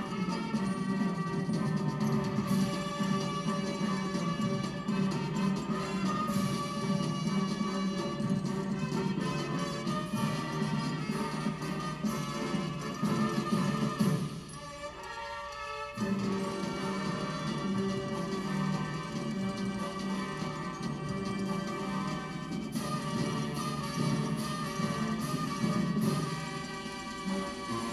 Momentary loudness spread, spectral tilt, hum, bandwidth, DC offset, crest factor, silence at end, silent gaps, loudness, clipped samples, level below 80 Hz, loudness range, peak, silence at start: 6 LU; -6 dB/octave; none; 13.5 kHz; under 0.1%; 16 dB; 0 s; none; -33 LUFS; under 0.1%; -58 dBFS; 3 LU; -16 dBFS; 0 s